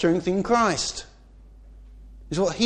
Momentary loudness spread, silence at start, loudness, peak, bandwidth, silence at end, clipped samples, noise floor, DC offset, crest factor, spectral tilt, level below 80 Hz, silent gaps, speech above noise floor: 11 LU; 0 s; -24 LUFS; -8 dBFS; 10 kHz; 0 s; under 0.1%; -48 dBFS; under 0.1%; 18 dB; -4.5 dB/octave; -46 dBFS; none; 26 dB